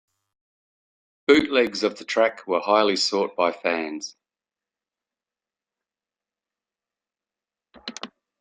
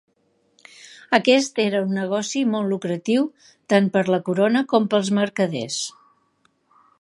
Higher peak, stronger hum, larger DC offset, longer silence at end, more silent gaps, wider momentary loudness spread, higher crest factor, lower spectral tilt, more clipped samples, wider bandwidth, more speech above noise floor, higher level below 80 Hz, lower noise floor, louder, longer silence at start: second, -4 dBFS vs 0 dBFS; neither; neither; second, 0.35 s vs 1.1 s; neither; first, 19 LU vs 7 LU; about the same, 22 dB vs 22 dB; second, -3 dB/octave vs -5 dB/octave; neither; second, 9.4 kHz vs 11.5 kHz; first, over 68 dB vs 45 dB; first, -66 dBFS vs -72 dBFS; first, under -90 dBFS vs -65 dBFS; about the same, -22 LUFS vs -21 LUFS; first, 1.3 s vs 0.85 s